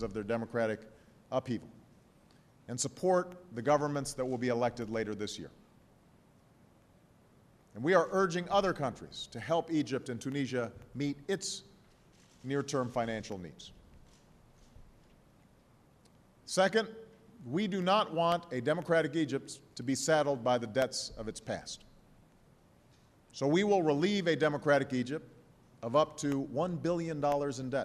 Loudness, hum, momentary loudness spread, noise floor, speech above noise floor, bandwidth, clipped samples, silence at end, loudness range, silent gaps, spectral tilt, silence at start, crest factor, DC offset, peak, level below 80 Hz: -33 LUFS; none; 14 LU; -64 dBFS; 31 dB; 13 kHz; under 0.1%; 0 s; 8 LU; none; -5 dB/octave; 0 s; 20 dB; under 0.1%; -14 dBFS; -64 dBFS